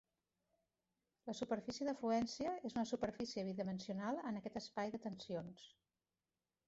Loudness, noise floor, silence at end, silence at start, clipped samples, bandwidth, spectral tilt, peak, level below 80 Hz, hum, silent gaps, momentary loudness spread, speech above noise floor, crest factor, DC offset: -44 LUFS; under -90 dBFS; 1 s; 1.25 s; under 0.1%; 8 kHz; -5 dB/octave; -28 dBFS; -76 dBFS; none; none; 10 LU; over 47 dB; 18 dB; under 0.1%